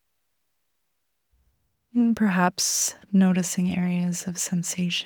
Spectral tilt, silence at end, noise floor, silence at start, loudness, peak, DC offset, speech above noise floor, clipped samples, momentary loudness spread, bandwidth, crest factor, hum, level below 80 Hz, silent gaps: -4 dB/octave; 0 s; -78 dBFS; 1.95 s; -23 LUFS; -6 dBFS; under 0.1%; 55 dB; under 0.1%; 6 LU; 19.5 kHz; 20 dB; none; -64 dBFS; none